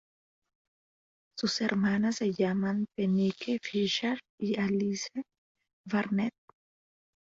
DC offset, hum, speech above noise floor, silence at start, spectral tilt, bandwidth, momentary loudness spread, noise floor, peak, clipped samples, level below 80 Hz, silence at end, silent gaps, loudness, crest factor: under 0.1%; none; over 60 dB; 1.35 s; -5.5 dB/octave; 7.8 kHz; 8 LU; under -90 dBFS; -12 dBFS; under 0.1%; -70 dBFS; 0.95 s; 4.29-4.38 s, 5.38-5.55 s, 5.73-5.84 s; -31 LUFS; 20 dB